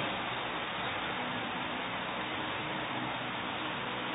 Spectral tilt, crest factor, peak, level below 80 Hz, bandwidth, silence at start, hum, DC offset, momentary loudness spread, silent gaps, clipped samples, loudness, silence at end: -0.5 dB/octave; 12 dB; -24 dBFS; -62 dBFS; 3.9 kHz; 0 s; none; under 0.1%; 1 LU; none; under 0.1%; -35 LUFS; 0 s